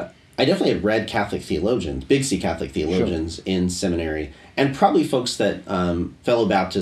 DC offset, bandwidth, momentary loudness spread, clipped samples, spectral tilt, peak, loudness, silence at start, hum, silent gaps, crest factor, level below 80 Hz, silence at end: under 0.1%; 13.5 kHz; 7 LU; under 0.1%; -5.5 dB/octave; -2 dBFS; -22 LUFS; 0 s; none; none; 20 dB; -42 dBFS; 0 s